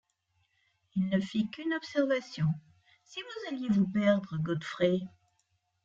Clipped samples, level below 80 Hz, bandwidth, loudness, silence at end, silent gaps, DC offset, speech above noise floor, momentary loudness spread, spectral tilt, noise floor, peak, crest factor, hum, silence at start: under 0.1%; -70 dBFS; 7.6 kHz; -31 LUFS; 0.75 s; none; under 0.1%; 46 dB; 12 LU; -7 dB/octave; -76 dBFS; -12 dBFS; 20 dB; none; 0.95 s